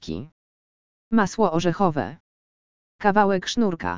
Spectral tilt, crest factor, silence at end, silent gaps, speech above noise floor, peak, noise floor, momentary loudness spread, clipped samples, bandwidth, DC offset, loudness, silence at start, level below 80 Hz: -5.5 dB/octave; 20 dB; 0 s; 0.32-1.11 s, 2.20-2.99 s; over 68 dB; -2 dBFS; under -90 dBFS; 13 LU; under 0.1%; 7.6 kHz; under 0.1%; -22 LUFS; 0 s; -52 dBFS